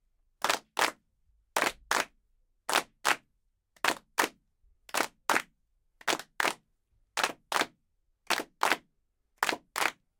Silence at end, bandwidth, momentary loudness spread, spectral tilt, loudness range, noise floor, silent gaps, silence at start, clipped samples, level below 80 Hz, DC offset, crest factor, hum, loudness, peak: 0.3 s; 19 kHz; 5 LU; -0.5 dB/octave; 2 LU; -75 dBFS; none; 0.45 s; under 0.1%; -70 dBFS; under 0.1%; 26 dB; none; -31 LUFS; -8 dBFS